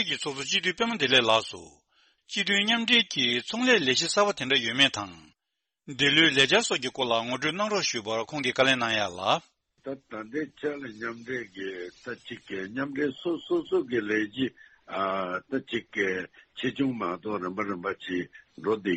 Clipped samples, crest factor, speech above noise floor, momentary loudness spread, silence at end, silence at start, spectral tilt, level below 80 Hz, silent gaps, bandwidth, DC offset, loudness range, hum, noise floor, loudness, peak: under 0.1%; 20 dB; 57 dB; 16 LU; 0 s; 0 s; -3 dB/octave; -68 dBFS; none; 8.8 kHz; under 0.1%; 10 LU; none; -85 dBFS; -26 LUFS; -8 dBFS